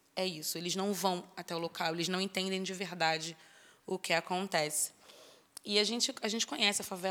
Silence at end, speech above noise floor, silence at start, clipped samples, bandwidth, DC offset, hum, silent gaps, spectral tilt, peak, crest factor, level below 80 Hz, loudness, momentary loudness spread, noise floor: 0 s; 24 dB; 0.15 s; under 0.1%; 20 kHz; under 0.1%; none; none; -2.5 dB/octave; -12 dBFS; 22 dB; -84 dBFS; -33 LUFS; 11 LU; -58 dBFS